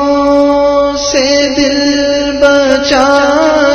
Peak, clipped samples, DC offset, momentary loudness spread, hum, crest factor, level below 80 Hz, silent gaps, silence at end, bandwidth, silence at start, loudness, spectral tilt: 0 dBFS; 0.8%; under 0.1%; 3 LU; none; 8 dB; -34 dBFS; none; 0 s; 8.8 kHz; 0 s; -9 LUFS; -3 dB/octave